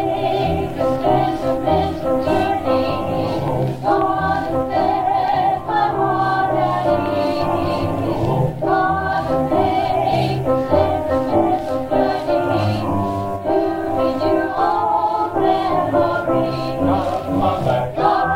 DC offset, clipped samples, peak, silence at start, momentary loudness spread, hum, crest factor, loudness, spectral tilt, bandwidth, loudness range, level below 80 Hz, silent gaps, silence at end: under 0.1%; under 0.1%; -2 dBFS; 0 s; 3 LU; none; 16 dB; -18 LUFS; -7.5 dB/octave; 16.5 kHz; 1 LU; -42 dBFS; none; 0 s